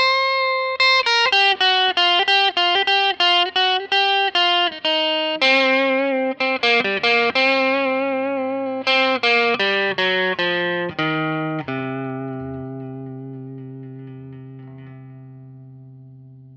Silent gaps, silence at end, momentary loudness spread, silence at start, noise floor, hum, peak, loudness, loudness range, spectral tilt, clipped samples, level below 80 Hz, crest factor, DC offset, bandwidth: none; 0 s; 18 LU; 0 s; -42 dBFS; none; -4 dBFS; -17 LUFS; 18 LU; -4 dB/octave; under 0.1%; -64 dBFS; 16 dB; under 0.1%; 8.8 kHz